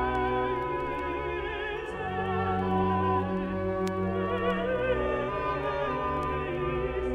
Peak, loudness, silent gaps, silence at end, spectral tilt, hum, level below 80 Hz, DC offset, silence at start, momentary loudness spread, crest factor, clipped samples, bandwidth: -14 dBFS; -30 LUFS; none; 0 s; -7.5 dB/octave; none; -44 dBFS; under 0.1%; 0 s; 5 LU; 14 dB; under 0.1%; 10.5 kHz